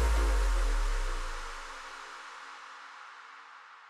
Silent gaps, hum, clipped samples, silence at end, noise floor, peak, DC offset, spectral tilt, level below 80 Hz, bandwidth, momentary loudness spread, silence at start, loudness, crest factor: none; none; under 0.1%; 0 s; -52 dBFS; -20 dBFS; under 0.1%; -4 dB/octave; -32 dBFS; 13 kHz; 18 LU; 0 s; -36 LUFS; 14 dB